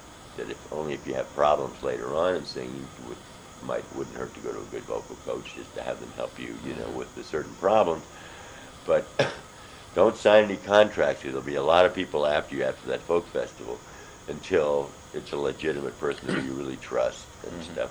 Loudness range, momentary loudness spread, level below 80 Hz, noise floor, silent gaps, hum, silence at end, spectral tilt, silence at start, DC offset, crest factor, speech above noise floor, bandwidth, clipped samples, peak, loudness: 12 LU; 19 LU; -56 dBFS; -46 dBFS; none; none; 0 s; -4.5 dB/octave; 0 s; under 0.1%; 24 dB; 19 dB; over 20 kHz; under 0.1%; -4 dBFS; -27 LUFS